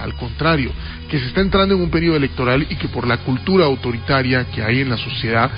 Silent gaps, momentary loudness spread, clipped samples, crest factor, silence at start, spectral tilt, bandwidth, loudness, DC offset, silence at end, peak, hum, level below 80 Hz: none; 7 LU; under 0.1%; 14 dB; 0 s; -11.5 dB/octave; 5.4 kHz; -18 LUFS; under 0.1%; 0 s; -4 dBFS; none; -32 dBFS